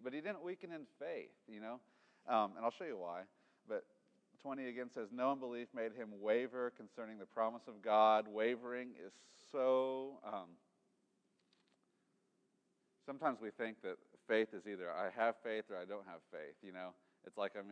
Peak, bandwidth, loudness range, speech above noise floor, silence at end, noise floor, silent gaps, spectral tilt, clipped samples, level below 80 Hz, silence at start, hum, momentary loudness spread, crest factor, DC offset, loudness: -18 dBFS; 9.2 kHz; 10 LU; 40 dB; 0 s; -81 dBFS; none; -5.5 dB/octave; under 0.1%; under -90 dBFS; 0 s; none; 17 LU; 24 dB; under 0.1%; -41 LUFS